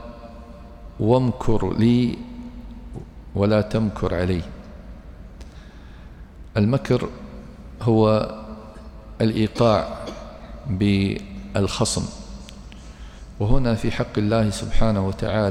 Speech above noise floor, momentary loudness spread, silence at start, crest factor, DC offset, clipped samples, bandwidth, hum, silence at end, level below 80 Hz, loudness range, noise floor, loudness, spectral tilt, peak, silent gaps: 21 dB; 23 LU; 0 s; 18 dB; under 0.1%; under 0.1%; 12 kHz; none; 0 s; -34 dBFS; 4 LU; -41 dBFS; -22 LUFS; -6.5 dB/octave; -4 dBFS; none